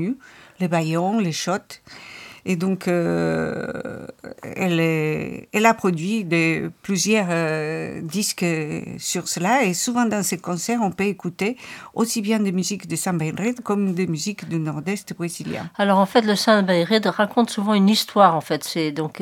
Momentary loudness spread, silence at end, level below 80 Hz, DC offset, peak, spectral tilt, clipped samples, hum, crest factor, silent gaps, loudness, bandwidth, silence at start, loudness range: 12 LU; 0 s; -62 dBFS; under 0.1%; -2 dBFS; -4.5 dB/octave; under 0.1%; none; 20 dB; none; -21 LUFS; 17.5 kHz; 0 s; 6 LU